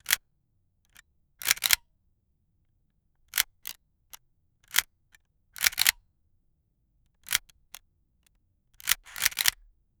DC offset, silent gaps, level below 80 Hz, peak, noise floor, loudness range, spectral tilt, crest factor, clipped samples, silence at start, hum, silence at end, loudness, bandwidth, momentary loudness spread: under 0.1%; none; -62 dBFS; 0 dBFS; -72 dBFS; 5 LU; 3 dB/octave; 34 dB; under 0.1%; 0.1 s; none; 0.5 s; -26 LUFS; over 20 kHz; 10 LU